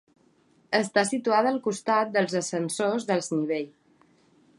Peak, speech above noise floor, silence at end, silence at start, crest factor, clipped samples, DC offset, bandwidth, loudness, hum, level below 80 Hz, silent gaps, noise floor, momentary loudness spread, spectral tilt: -8 dBFS; 37 dB; 0.9 s; 0.7 s; 18 dB; under 0.1%; under 0.1%; 11.5 kHz; -26 LUFS; none; -78 dBFS; none; -63 dBFS; 6 LU; -4 dB/octave